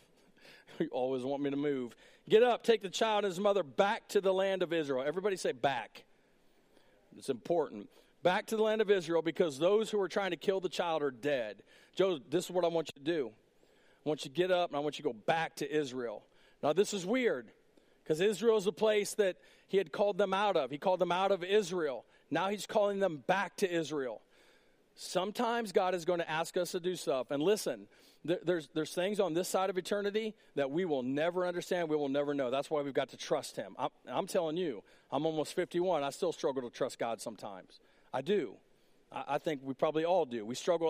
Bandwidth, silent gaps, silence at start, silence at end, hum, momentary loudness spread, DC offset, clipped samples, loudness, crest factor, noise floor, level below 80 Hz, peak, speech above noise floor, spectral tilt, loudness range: 15.5 kHz; none; 0.45 s; 0 s; none; 9 LU; under 0.1%; under 0.1%; -34 LUFS; 20 dB; -67 dBFS; -78 dBFS; -14 dBFS; 34 dB; -4.5 dB/octave; 5 LU